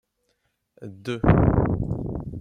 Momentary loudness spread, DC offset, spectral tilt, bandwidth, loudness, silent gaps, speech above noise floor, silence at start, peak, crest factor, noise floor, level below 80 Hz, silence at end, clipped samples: 21 LU; under 0.1%; -9.5 dB/octave; 9 kHz; -23 LUFS; none; 50 dB; 0.8 s; -4 dBFS; 20 dB; -73 dBFS; -34 dBFS; 0 s; under 0.1%